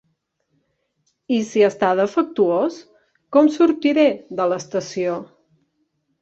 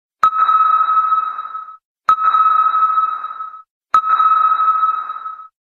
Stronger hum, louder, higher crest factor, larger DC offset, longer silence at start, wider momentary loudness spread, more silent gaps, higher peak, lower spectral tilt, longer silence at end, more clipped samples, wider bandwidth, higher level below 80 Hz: neither; second, -19 LUFS vs -14 LUFS; about the same, 18 dB vs 14 dB; neither; first, 1.3 s vs 0.25 s; second, 8 LU vs 16 LU; second, none vs 1.85-1.96 s, 3.70-3.81 s; about the same, -2 dBFS vs 0 dBFS; first, -5.5 dB/octave vs -1.5 dB/octave; first, 0.95 s vs 0.15 s; neither; first, 8 kHz vs 7 kHz; about the same, -66 dBFS vs -66 dBFS